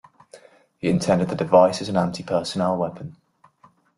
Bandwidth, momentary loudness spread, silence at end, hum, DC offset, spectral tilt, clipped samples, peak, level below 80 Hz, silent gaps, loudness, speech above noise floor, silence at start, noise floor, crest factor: 11.5 kHz; 12 LU; 0.85 s; none; under 0.1%; -6 dB/octave; under 0.1%; -2 dBFS; -58 dBFS; none; -21 LUFS; 36 dB; 0.35 s; -57 dBFS; 20 dB